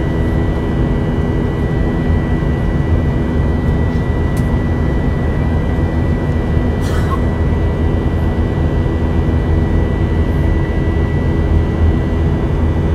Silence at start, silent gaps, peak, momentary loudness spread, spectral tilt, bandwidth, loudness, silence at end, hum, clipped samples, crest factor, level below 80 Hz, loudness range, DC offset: 0 s; none; 0 dBFS; 2 LU; -8.5 dB/octave; 8 kHz; -16 LUFS; 0 s; none; under 0.1%; 12 dB; -20 dBFS; 1 LU; under 0.1%